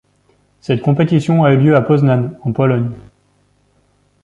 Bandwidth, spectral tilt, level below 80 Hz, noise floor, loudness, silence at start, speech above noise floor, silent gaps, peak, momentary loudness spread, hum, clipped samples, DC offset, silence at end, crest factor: 8 kHz; -9 dB/octave; -50 dBFS; -57 dBFS; -14 LUFS; 0.7 s; 44 dB; none; -2 dBFS; 11 LU; 50 Hz at -35 dBFS; under 0.1%; under 0.1%; 1.25 s; 14 dB